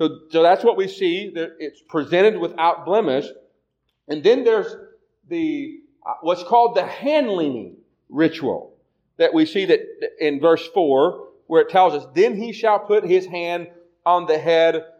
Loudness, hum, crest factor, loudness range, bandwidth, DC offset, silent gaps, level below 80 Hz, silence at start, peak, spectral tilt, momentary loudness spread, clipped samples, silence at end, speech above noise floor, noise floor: -19 LUFS; none; 16 dB; 3 LU; 7.4 kHz; under 0.1%; none; -74 dBFS; 0 s; -4 dBFS; -6 dB/octave; 14 LU; under 0.1%; 0.1 s; 54 dB; -72 dBFS